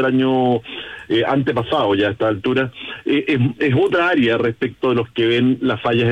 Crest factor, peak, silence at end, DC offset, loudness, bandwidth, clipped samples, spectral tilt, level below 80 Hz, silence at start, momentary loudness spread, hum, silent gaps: 10 dB; -6 dBFS; 0 s; under 0.1%; -18 LUFS; 8.8 kHz; under 0.1%; -7.5 dB/octave; -54 dBFS; 0 s; 6 LU; none; none